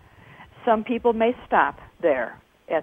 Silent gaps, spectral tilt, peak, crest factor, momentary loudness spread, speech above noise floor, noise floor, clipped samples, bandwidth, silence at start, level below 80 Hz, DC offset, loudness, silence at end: none; -7.5 dB/octave; -4 dBFS; 20 dB; 7 LU; 26 dB; -48 dBFS; under 0.1%; 3.8 kHz; 0.4 s; -56 dBFS; under 0.1%; -23 LUFS; 0 s